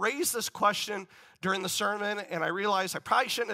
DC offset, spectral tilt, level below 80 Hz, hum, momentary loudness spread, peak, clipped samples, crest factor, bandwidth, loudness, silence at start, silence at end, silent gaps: under 0.1%; -2.5 dB/octave; -76 dBFS; none; 6 LU; -12 dBFS; under 0.1%; 18 dB; 16 kHz; -29 LUFS; 0 s; 0 s; none